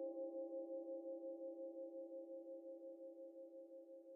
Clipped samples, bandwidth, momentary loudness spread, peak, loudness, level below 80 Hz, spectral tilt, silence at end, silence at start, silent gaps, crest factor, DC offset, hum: under 0.1%; 1.2 kHz; 9 LU; -38 dBFS; -52 LUFS; under -90 dBFS; 8 dB/octave; 0 s; 0 s; none; 12 dB; under 0.1%; none